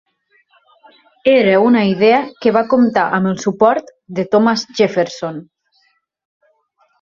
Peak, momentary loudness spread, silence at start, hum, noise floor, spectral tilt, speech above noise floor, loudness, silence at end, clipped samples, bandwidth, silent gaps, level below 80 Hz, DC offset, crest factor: 0 dBFS; 12 LU; 1.25 s; none; -61 dBFS; -6 dB/octave; 47 dB; -14 LUFS; 1.6 s; under 0.1%; 7.4 kHz; none; -58 dBFS; under 0.1%; 16 dB